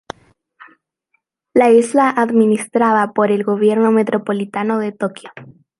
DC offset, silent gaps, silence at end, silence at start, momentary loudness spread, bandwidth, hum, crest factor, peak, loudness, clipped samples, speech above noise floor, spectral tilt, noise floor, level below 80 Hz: under 0.1%; none; 0.3 s; 1.55 s; 13 LU; 11.5 kHz; none; 14 dB; -2 dBFS; -15 LUFS; under 0.1%; 53 dB; -6 dB/octave; -68 dBFS; -64 dBFS